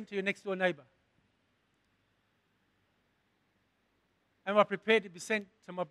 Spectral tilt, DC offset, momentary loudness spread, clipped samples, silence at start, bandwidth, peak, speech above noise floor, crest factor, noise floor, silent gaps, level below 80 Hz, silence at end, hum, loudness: -4.5 dB/octave; under 0.1%; 14 LU; under 0.1%; 0 s; 12.5 kHz; -10 dBFS; 43 dB; 26 dB; -76 dBFS; none; -84 dBFS; 0.05 s; none; -32 LUFS